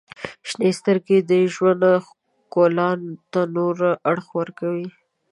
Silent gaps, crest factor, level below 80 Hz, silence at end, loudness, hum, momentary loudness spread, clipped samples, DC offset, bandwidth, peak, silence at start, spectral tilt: none; 16 dB; -70 dBFS; 0.45 s; -20 LUFS; none; 11 LU; under 0.1%; under 0.1%; 11 kHz; -4 dBFS; 0.2 s; -6.5 dB/octave